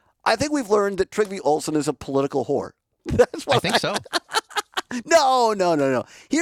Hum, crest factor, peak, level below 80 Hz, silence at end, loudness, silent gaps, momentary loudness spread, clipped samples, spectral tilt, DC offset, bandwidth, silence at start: none; 18 dB; -2 dBFS; -50 dBFS; 0 s; -22 LUFS; none; 8 LU; under 0.1%; -4 dB/octave; under 0.1%; 18.5 kHz; 0.25 s